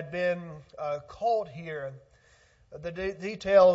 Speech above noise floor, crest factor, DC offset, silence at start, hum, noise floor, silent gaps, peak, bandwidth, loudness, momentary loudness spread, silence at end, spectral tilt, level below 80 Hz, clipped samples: 34 dB; 20 dB; under 0.1%; 0 s; none; -61 dBFS; none; -8 dBFS; 7.8 kHz; -30 LUFS; 15 LU; 0 s; -6 dB/octave; -60 dBFS; under 0.1%